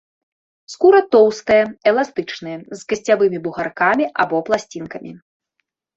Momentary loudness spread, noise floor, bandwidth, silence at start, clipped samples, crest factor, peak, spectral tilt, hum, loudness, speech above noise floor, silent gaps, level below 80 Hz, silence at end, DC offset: 18 LU; -74 dBFS; 8 kHz; 0.7 s; under 0.1%; 16 dB; -2 dBFS; -5 dB/octave; none; -16 LUFS; 57 dB; none; -58 dBFS; 0.8 s; under 0.1%